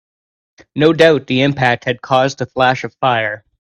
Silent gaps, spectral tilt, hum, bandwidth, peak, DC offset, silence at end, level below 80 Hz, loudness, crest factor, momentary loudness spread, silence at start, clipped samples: none; -5.5 dB/octave; none; 11 kHz; 0 dBFS; under 0.1%; 0.25 s; -52 dBFS; -14 LUFS; 16 dB; 8 LU; 0.75 s; under 0.1%